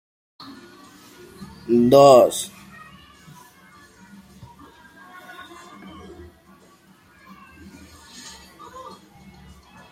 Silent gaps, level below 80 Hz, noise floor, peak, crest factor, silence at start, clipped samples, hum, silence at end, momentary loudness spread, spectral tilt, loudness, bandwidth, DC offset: none; -58 dBFS; -53 dBFS; 0 dBFS; 24 dB; 1.4 s; under 0.1%; none; 7.45 s; 31 LU; -5.5 dB/octave; -15 LUFS; 16.5 kHz; under 0.1%